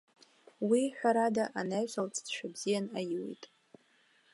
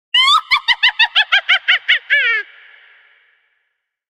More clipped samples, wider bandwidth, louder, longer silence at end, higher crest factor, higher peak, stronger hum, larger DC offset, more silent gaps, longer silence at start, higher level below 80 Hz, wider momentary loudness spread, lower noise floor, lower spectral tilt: neither; second, 11.5 kHz vs 16.5 kHz; second, -33 LUFS vs -12 LUFS; second, 0.9 s vs 1.7 s; about the same, 18 dB vs 16 dB; second, -16 dBFS vs 0 dBFS; neither; neither; neither; first, 0.6 s vs 0.15 s; second, -84 dBFS vs -60 dBFS; first, 10 LU vs 5 LU; about the same, -69 dBFS vs -71 dBFS; first, -4.5 dB/octave vs 3 dB/octave